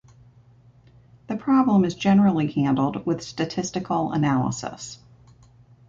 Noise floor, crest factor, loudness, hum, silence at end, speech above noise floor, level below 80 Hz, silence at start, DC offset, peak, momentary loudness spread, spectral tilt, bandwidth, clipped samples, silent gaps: -53 dBFS; 16 dB; -23 LUFS; none; 0.95 s; 31 dB; -56 dBFS; 1.3 s; under 0.1%; -8 dBFS; 14 LU; -6.5 dB/octave; 7.8 kHz; under 0.1%; none